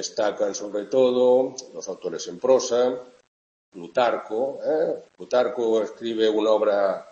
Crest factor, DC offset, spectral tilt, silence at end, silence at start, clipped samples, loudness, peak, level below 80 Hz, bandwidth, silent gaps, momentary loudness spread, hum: 16 dB; under 0.1%; -3.5 dB/octave; 0.1 s; 0 s; under 0.1%; -23 LUFS; -6 dBFS; -74 dBFS; 7.6 kHz; 3.28-3.72 s; 12 LU; none